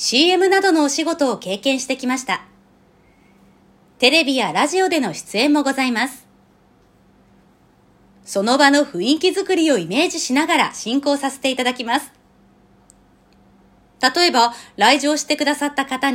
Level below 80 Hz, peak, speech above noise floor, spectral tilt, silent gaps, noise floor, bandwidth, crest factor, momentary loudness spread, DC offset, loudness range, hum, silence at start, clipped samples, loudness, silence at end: -64 dBFS; 0 dBFS; 37 dB; -2.5 dB/octave; none; -54 dBFS; 16.5 kHz; 20 dB; 8 LU; under 0.1%; 6 LU; none; 0 s; under 0.1%; -17 LUFS; 0 s